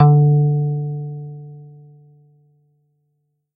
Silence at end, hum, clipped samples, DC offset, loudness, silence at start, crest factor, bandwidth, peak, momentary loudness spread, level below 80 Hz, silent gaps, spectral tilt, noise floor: 1.9 s; none; under 0.1%; under 0.1%; -17 LUFS; 0 s; 18 dB; 1.6 kHz; 0 dBFS; 25 LU; -62 dBFS; none; -14.5 dB/octave; -70 dBFS